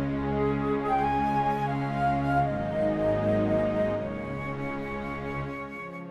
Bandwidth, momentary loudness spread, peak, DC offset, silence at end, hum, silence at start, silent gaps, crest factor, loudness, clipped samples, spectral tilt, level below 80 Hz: 11 kHz; 8 LU; -14 dBFS; under 0.1%; 0 s; none; 0 s; none; 14 dB; -28 LUFS; under 0.1%; -8.5 dB/octave; -46 dBFS